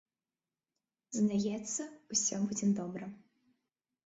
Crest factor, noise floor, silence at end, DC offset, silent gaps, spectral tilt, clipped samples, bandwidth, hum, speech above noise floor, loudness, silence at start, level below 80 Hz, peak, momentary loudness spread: 18 dB; under -90 dBFS; 0.9 s; under 0.1%; none; -4.5 dB/octave; under 0.1%; 8.2 kHz; none; over 56 dB; -34 LUFS; 1.1 s; -74 dBFS; -18 dBFS; 11 LU